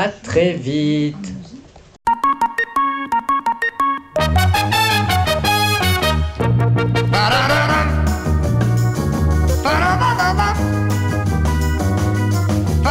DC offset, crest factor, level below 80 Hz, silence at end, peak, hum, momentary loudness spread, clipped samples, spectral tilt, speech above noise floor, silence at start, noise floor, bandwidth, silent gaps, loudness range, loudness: under 0.1%; 14 dB; -26 dBFS; 0 s; -2 dBFS; none; 4 LU; under 0.1%; -5.5 dB/octave; 22 dB; 0 s; -40 dBFS; 16.5 kHz; none; 4 LU; -17 LUFS